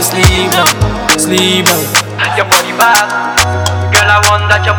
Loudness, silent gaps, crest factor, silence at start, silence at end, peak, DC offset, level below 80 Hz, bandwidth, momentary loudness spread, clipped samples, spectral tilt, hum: -9 LUFS; none; 10 dB; 0 s; 0 s; 0 dBFS; under 0.1%; -26 dBFS; over 20 kHz; 5 LU; 2%; -3 dB/octave; none